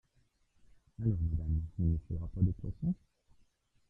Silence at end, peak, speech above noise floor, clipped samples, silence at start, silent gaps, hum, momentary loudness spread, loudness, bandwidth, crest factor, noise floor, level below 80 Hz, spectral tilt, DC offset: 0.95 s; -16 dBFS; 39 dB; under 0.1%; 1 s; none; none; 4 LU; -36 LUFS; 1.6 kHz; 20 dB; -73 dBFS; -46 dBFS; -12.5 dB/octave; under 0.1%